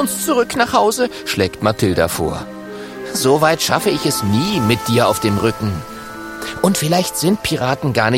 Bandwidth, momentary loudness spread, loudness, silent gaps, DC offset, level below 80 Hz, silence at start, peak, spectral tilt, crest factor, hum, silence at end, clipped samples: 16.5 kHz; 13 LU; -16 LUFS; none; under 0.1%; -42 dBFS; 0 s; 0 dBFS; -4.5 dB/octave; 16 dB; none; 0 s; under 0.1%